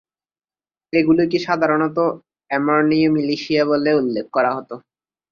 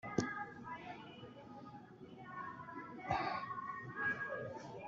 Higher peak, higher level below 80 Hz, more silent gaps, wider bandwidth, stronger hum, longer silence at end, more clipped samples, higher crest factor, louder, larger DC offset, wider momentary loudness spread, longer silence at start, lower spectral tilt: first, -2 dBFS vs -18 dBFS; first, -60 dBFS vs -72 dBFS; neither; about the same, 7 kHz vs 7.6 kHz; neither; first, 0.55 s vs 0 s; neither; second, 16 dB vs 26 dB; first, -18 LUFS vs -44 LUFS; neither; second, 9 LU vs 15 LU; first, 0.95 s vs 0.05 s; first, -7 dB/octave vs -4 dB/octave